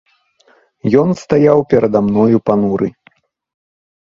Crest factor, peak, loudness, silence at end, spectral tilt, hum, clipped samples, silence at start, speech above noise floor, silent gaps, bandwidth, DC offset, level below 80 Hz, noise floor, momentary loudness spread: 14 dB; 0 dBFS; -13 LUFS; 1.15 s; -8.5 dB/octave; none; under 0.1%; 0.85 s; 41 dB; none; 7.4 kHz; under 0.1%; -50 dBFS; -53 dBFS; 8 LU